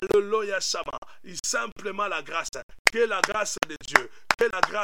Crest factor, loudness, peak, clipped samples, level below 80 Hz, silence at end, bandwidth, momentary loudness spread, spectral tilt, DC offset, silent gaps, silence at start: 26 dB; -26 LUFS; 0 dBFS; under 0.1%; -56 dBFS; 0 s; 17 kHz; 9 LU; -1.5 dB/octave; 0.7%; 0.98-1.02 s, 1.72-1.76 s, 2.63-2.69 s, 2.79-2.85 s; 0 s